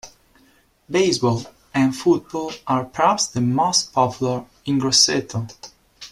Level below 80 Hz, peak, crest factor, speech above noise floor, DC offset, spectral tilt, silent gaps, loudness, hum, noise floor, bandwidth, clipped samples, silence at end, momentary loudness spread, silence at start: -56 dBFS; -2 dBFS; 20 dB; 37 dB; under 0.1%; -3.5 dB/octave; none; -20 LUFS; none; -57 dBFS; 14 kHz; under 0.1%; 0.05 s; 12 LU; 0.05 s